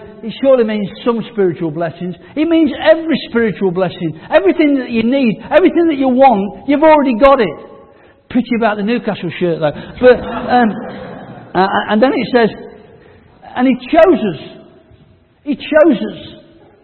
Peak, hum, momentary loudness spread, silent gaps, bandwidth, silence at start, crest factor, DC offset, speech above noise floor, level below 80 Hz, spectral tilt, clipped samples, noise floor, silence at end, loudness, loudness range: 0 dBFS; none; 14 LU; none; 4.5 kHz; 0 s; 14 dB; under 0.1%; 35 dB; -44 dBFS; -9 dB/octave; under 0.1%; -48 dBFS; 0.5 s; -13 LUFS; 4 LU